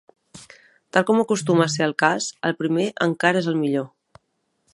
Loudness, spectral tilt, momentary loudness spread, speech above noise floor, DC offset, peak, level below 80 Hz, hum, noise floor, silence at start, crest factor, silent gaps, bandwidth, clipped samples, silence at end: -21 LUFS; -5 dB/octave; 6 LU; 51 dB; under 0.1%; -2 dBFS; -70 dBFS; none; -72 dBFS; 0.35 s; 22 dB; none; 11.5 kHz; under 0.1%; 0.9 s